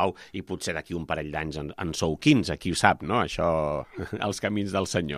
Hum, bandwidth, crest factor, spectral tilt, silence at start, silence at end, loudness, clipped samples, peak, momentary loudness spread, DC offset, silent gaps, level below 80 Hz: none; 14.5 kHz; 24 dB; -5 dB/octave; 0 s; 0 s; -27 LUFS; under 0.1%; -2 dBFS; 11 LU; under 0.1%; none; -48 dBFS